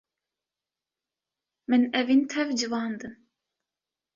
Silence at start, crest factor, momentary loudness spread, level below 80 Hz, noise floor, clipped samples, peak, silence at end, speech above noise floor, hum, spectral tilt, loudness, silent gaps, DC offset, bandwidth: 1.7 s; 18 dB; 17 LU; -72 dBFS; under -90 dBFS; under 0.1%; -12 dBFS; 1 s; over 65 dB; none; -3.5 dB/octave; -25 LUFS; none; under 0.1%; 7.4 kHz